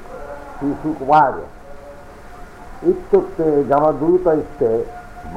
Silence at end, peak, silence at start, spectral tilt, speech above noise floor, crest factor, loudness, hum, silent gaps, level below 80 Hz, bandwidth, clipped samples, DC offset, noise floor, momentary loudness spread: 0 s; -4 dBFS; 0 s; -8.5 dB/octave; 20 dB; 16 dB; -17 LUFS; none; none; -40 dBFS; 11 kHz; under 0.1%; under 0.1%; -37 dBFS; 24 LU